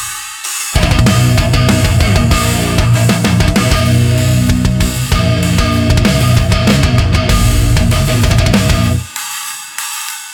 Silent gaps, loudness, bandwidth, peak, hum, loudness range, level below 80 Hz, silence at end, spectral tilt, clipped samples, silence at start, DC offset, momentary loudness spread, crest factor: none; -12 LUFS; 18 kHz; 0 dBFS; none; 1 LU; -18 dBFS; 0 s; -5 dB/octave; under 0.1%; 0 s; under 0.1%; 9 LU; 10 dB